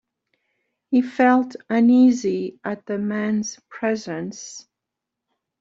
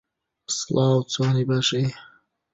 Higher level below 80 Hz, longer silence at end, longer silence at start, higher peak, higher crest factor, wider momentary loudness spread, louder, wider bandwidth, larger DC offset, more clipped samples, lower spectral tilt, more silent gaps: second, -68 dBFS vs -60 dBFS; first, 1 s vs 0.5 s; first, 0.9 s vs 0.5 s; first, -4 dBFS vs -8 dBFS; about the same, 18 dB vs 16 dB; first, 16 LU vs 8 LU; about the same, -21 LUFS vs -23 LUFS; about the same, 7.6 kHz vs 8 kHz; neither; neither; about the same, -5.5 dB/octave vs -5 dB/octave; neither